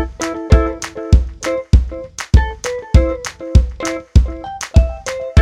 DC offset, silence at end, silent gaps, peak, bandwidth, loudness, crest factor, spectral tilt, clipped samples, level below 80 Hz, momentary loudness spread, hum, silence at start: under 0.1%; 0 s; none; 0 dBFS; 11 kHz; -17 LUFS; 14 dB; -6 dB/octave; 0.3%; -16 dBFS; 10 LU; none; 0 s